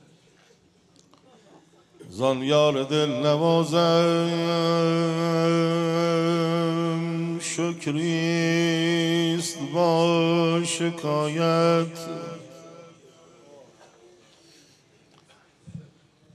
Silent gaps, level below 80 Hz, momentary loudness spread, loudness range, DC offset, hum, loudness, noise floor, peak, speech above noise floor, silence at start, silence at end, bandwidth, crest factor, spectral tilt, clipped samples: none; -74 dBFS; 11 LU; 5 LU; under 0.1%; none; -23 LUFS; -59 dBFS; -8 dBFS; 37 dB; 2 s; 0.55 s; 12.5 kHz; 16 dB; -5.5 dB/octave; under 0.1%